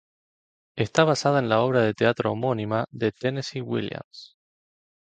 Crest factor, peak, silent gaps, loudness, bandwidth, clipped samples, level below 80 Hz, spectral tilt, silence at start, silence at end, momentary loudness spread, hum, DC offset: 22 dB; -4 dBFS; 4.04-4.11 s; -24 LUFS; 9.2 kHz; under 0.1%; -62 dBFS; -6 dB/octave; 0.75 s; 0.75 s; 15 LU; none; under 0.1%